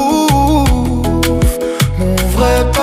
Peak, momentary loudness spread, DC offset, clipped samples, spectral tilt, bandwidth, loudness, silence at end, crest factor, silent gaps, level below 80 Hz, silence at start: 0 dBFS; 4 LU; under 0.1%; under 0.1%; -5.5 dB/octave; 16 kHz; -13 LUFS; 0 s; 12 dB; none; -18 dBFS; 0 s